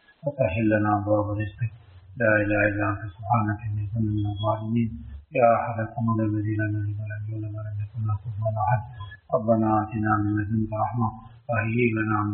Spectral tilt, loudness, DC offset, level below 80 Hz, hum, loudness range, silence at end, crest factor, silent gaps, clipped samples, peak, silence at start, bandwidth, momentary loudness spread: -7.5 dB/octave; -25 LUFS; under 0.1%; -48 dBFS; none; 3 LU; 0 s; 20 dB; none; under 0.1%; -6 dBFS; 0.25 s; 3.7 kHz; 11 LU